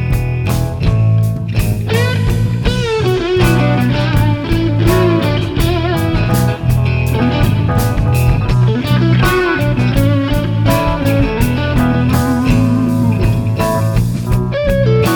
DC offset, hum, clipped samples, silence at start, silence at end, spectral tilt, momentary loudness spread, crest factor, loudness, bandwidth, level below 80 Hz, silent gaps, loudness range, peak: under 0.1%; none; under 0.1%; 0 s; 0 s; -7 dB/octave; 4 LU; 12 dB; -14 LUFS; 19.5 kHz; -22 dBFS; none; 1 LU; 0 dBFS